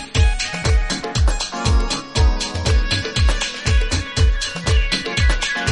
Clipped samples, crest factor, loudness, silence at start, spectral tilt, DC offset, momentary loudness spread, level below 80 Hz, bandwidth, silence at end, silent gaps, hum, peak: under 0.1%; 14 dB; -19 LUFS; 0 s; -4 dB/octave; under 0.1%; 3 LU; -20 dBFS; 11.5 kHz; 0 s; none; none; -4 dBFS